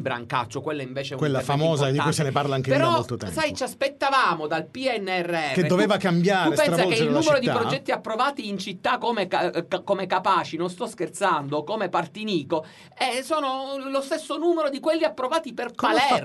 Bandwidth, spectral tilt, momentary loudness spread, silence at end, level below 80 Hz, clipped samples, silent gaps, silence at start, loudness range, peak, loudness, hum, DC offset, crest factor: 12 kHz; -5 dB/octave; 9 LU; 0 s; -64 dBFS; under 0.1%; none; 0 s; 5 LU; -6 dBFS; -24 LUFS; none; under 0.1%; 18 dB